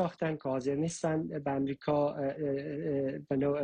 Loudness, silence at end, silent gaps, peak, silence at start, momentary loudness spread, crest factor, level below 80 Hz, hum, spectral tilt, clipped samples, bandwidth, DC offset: -33 LUFS; 0 s; none; -18 dBFS; 0 s; 4 LU; 14 dB; -64 dBFS; none; -7 dB/octave; under 0.1%; 9.6 kHz; under 0.1%